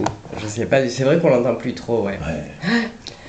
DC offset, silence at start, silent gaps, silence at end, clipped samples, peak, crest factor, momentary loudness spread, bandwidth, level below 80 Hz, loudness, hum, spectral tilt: under 0.1%; 0 s; none; 0 s; under 0.1%; -2 dBFS; 18 dB; 12 LU; 9 kHz; -44 dBFS; -20 LUFS; none; -6 dB/octave